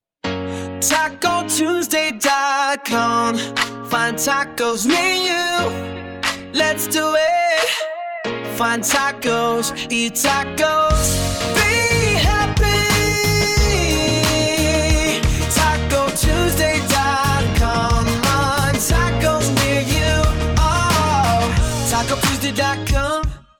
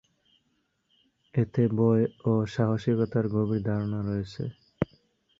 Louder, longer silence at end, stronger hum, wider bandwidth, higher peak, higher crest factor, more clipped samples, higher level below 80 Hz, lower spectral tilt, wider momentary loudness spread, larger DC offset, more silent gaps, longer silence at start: first, -17 LUFS vs -28 LUFS; second, 0.2 s vs 0.55 s; neither; first, 19 kHz vs 7.4 kHz; first, -2 dBFS vs -8 dBFS; about the same, 16 dB vs 20 dB; neither; first, -26 dBFS vs -54 dBFS; second, -3.5 dB/octave vs -9 dB/octave; second, 5 LU vs 10 LU; neither; neither; second, 0.25 s vs 1.35 s